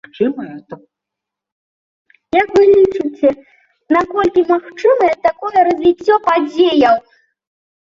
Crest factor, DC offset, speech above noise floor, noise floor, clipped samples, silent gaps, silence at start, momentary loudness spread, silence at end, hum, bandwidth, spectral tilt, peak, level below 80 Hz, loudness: 14 dB; under 0.1%; 69 dB; -82 dBFS; under 0.1%; 1.52-2.05 s; 0.2 s; 8 LU; 0.85 s; none; 7.4 kHz; -5.5 dB/octave; -2 dBFS; -52 dBFS; -13 LUFS